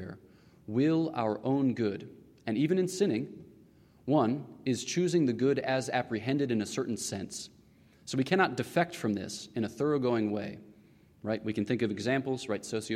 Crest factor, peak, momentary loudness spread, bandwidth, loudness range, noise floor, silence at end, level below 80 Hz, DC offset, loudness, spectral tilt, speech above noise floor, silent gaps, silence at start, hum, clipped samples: 18 dB; -14 dBFS; 15 LU; 15.5 kHz; 2 LU; -60 dBFS; 0 s; -70 dBFS; under 0.1%; -31 LUFS; -5.5 dB/octave; 30 dB; none; 0 s; none; under 0.1%